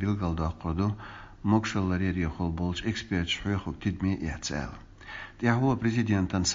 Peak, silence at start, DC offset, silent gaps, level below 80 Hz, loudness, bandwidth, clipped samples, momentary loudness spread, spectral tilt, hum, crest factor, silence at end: -10 dBFS; 0 s; under 0.1%; none; -44 dBFS; -29 LUFS; 7.6 kHz; under 0.1%; 13 LU; -5.5 dB/octave; none; 20 dB; 0 s